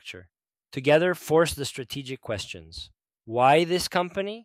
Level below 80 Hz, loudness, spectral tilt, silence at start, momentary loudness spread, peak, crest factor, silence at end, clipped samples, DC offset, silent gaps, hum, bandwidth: -56 dBFS; -24 LUFS; -4.5 dB/octave; 0.05 s; 21 LU; -8 dBFS; 18 dB; 0.05 s; under 0.1%; under 0.1%; none; none; 16 kHz